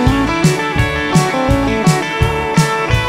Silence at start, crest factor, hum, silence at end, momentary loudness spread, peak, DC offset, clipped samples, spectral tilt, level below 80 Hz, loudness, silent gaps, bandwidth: 0 s; 14 dB; none; 0 s; 2 LU; 0 dBFS; under 0.1%; under 0.1%; -5.5 dB/octave; -26 dBFS; -14 LUFS; none; 16 kHz